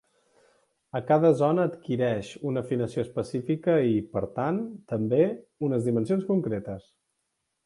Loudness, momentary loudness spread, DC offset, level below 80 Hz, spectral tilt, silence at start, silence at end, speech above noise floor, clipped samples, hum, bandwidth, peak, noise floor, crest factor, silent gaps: -27 LUFS; 10 LU; under 0.1%; -62 dBFS; -8.5 dB/octave; 0.95 s; 0.85 s; 53 dB; under 0.1%; none; 11.5 kHz; -8 dBFS; -79 dBFS; 18 dB; none